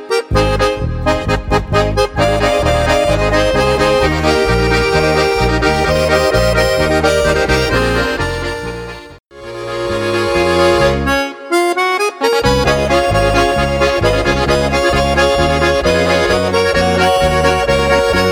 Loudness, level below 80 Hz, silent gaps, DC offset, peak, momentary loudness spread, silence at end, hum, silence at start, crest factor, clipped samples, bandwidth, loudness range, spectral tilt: -13 LUFS; -24 dBFS; 9.20-9.24 s; under 0.1%; 0 dBFS; 5 LU; 0 s; none; 0 s; 12 dB; under 0.1%; 19 kHz; 4 LU; -5 dB/octave